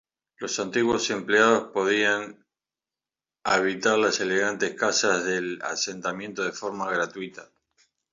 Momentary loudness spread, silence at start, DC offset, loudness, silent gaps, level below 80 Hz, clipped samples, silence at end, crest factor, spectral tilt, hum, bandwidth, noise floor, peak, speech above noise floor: 10 LU; 0.4 s; under 0.1%; -24 LUFS; none; -66 dBFS; under 0.1%; 0.7 s; 20 dB; -2.5 dB/octave; none; 7.8 kHz; under -90 dBFS; -6 dBFS; over 65 dB